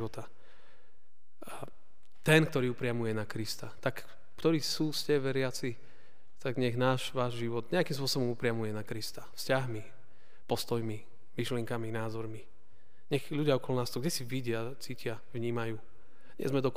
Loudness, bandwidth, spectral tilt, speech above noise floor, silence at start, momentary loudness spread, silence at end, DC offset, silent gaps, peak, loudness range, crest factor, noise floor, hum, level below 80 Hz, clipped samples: -34 LUFS; 15.5 kHz; -5 dB/octave; 43 dB; 0 s; 14 LU; 0 s; 1%; none; -10 dBFS; 4 LU; 26 dB; -76 dBFS; none; -66 dBFS; under 0.1%